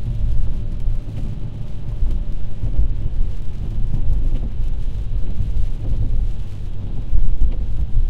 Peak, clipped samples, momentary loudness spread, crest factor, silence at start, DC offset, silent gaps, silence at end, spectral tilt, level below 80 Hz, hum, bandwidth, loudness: -2 dBFS; under 0.1%; 6 LU; 12 dB; 0 s; under 0.1%; none; 0 s; -8.5 dB/octave; -20 dBFS; none; 3.4 kHz; -26 LUFS